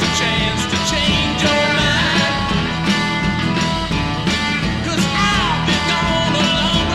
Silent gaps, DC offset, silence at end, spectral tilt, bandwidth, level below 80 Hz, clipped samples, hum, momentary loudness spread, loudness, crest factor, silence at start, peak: none; 0.5%; 0 s; -4 dB/octave; 13.5 kHz; -32 dBFS; under 0.1%; none; 4 LU; -16 LUFS; 14 dB; 0 s; -4 dBFS